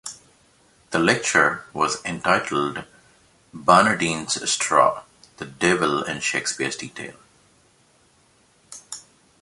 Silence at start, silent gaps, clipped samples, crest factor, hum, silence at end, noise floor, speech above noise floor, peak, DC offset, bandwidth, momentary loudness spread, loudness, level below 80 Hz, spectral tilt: 0.05 s; none; under 0.1%; 22 dB; none; 0.4 s; -59 dBFS; 38 dB; 0 dBFS; under 0.1%; 11.5 kHz; 20 LU; -21 LUFS; -58 dBFS; -3 dB/octave